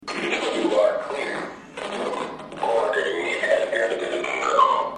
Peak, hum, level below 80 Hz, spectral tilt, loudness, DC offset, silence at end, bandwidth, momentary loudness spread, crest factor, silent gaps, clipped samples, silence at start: -6 dBFS; none; -62 dBFS; -3 dB/octave; -23 LUFS; under 0.1%; 0 s; 11 kHz; 12 LU; 18 dB; none; under 0.1%; 0 s